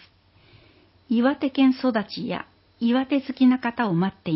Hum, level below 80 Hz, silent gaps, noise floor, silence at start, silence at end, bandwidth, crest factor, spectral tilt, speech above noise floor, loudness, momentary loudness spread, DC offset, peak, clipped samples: none; -62 dBFS; none; -56 dBFS; 1.1 s; 0 s; 5.8 kHz; 16 dB; -10.5 dB/octave; 34 dB; -23 LUFS; 10 LU; under 0.1%; -8 dBFS; under 0.1%